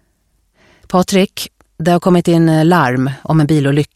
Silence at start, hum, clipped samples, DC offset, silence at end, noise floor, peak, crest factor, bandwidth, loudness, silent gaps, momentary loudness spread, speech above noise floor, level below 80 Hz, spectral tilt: 0.9 s; none; under 0.1%; under 0.1%; 0.1 s; -60 dBFS; 0 dBFS; 14 dB; 15 kHz; -13 LUFS; none; 8 LU; 48 dB; -48 dBFS; -6.5 dB/octave